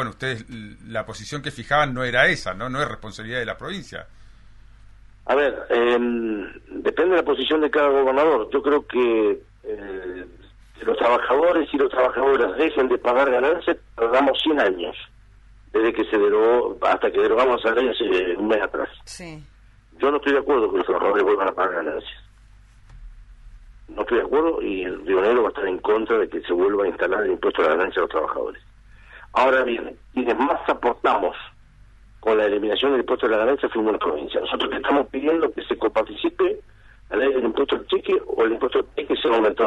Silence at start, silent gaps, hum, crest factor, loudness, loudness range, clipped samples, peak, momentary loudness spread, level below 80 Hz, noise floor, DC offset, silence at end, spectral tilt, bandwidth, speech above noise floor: 0 s; none; none; 20 dB; -21 LUFS; 5 LU; under 0.1%; -2 dBFS; 13 LU; -48 dBFS; -49 dBFS; under 0.1%; 0 s; -5.5 dB/octave; 11 kHz; 28 dB